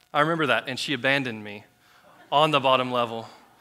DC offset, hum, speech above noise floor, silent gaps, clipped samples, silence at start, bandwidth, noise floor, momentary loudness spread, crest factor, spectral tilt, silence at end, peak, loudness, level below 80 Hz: under 0.1%; none; 32 dB; none; under 0.1%; 0.15 s; 16 kHz; -56 dBFS; 17 LU; 20 dB; -4.5 dB/octave; 0.25 s; -4 dBFS; -23 LUFS; -74 dBFS